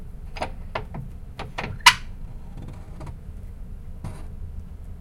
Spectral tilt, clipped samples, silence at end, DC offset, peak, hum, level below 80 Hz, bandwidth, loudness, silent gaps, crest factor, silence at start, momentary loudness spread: -2 dB/octave; under 0.1%; 0 s; under 0.1%; 0 dBFS; none; -38 dBFS; 16.5 kHz; -22 LUFS; none; 28 dB; 0 s; 25 LU